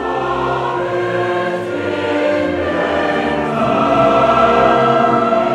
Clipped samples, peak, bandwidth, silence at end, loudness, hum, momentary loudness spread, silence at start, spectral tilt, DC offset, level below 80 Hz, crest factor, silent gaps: under 0.1%; 0 dBFS; 10.5 kHz; 0 s; -15 LUFS; none; 7 LU; 0 s; -6.5 dB/octave; under 0.1%; -42 dBFS; 14 dB; none